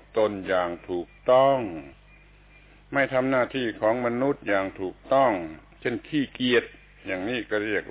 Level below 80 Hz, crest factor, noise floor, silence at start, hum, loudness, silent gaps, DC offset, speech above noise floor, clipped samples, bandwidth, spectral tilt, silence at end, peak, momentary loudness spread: -54 dBFS; 18 dB; -53 dBFS; 0.15 s; none; -25 LUFS; none; under 0.1%; 28 dB; under 0.1%; 4 kHz; -9 dB/octave; 0 s; -8 dBFS; 11 LU